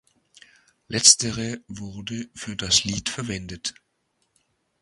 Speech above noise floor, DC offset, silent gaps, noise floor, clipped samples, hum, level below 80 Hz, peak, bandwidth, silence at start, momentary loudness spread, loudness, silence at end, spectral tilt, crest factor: 48 dB; under 0.1%; none; -72 dBFS; under 0.1%; none; -52 dBFS; 0 dBFS; 12 kHz; 0.9 s; 19 LU; -21 LUFS; 1.1 s; -1.5 dB/octave; 26 dB